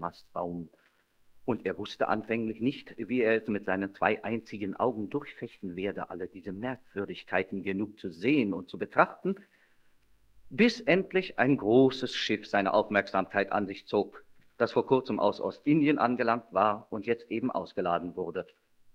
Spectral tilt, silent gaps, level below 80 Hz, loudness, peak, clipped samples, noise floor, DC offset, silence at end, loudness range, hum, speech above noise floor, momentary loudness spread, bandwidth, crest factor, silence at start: -6.5 dB/octave; none; -68 dBFS; -30 LUFS; -6 dBFS; under 0.1%; -64 dBFS; under 0.1%; 0.5 s; 7 LU; none; 34 dB; 12 LU; 8.6 kHz; 24 dB; 0 s